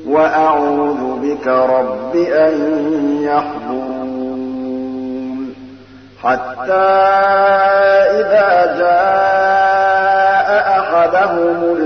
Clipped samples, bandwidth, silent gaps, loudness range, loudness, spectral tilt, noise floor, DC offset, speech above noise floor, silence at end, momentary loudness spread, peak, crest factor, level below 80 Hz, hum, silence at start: under 0.1%; 6.4 kHz; none; 9 LU; -13 LUFS; -6 dB/octave; -38 dBFS; 0.2%; 25 dB; 0 s; 11 LU; -2 dBFS; 10 dB; -54 dBFS; none; 0 s